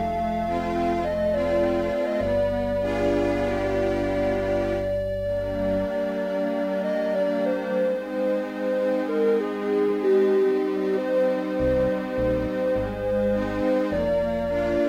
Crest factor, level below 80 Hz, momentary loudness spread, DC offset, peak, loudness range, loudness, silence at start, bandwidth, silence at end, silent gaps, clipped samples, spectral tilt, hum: 12 dB; -42 dBFS; 3 LU; under 0.1%; -12 dBFS; 2 LU; -24 LUFS; 0 s; 16 kHz; 0 s; none; under 0.1%; -7.5 dB/octave; none